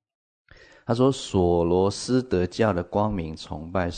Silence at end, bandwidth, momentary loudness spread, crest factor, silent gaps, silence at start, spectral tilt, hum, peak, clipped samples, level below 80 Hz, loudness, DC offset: 0 s; 9.6 kHz; 10 LU; 16 dB; none; 0.85 s; -6.5 dB/octave; none; -8 dBFS; under 0.1%; -48 dBFS; -24 LUFS; under 0.1%